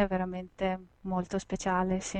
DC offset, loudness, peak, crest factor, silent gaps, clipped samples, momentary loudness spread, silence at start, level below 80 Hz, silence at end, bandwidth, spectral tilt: under 0.1%; -33 LUFS; -16 dBFS; 16 dB; none; under 0.1%; 6 LU; 0 s; -50 dBFS; 0 s; 9.6 kHz; -5.5 dB/octave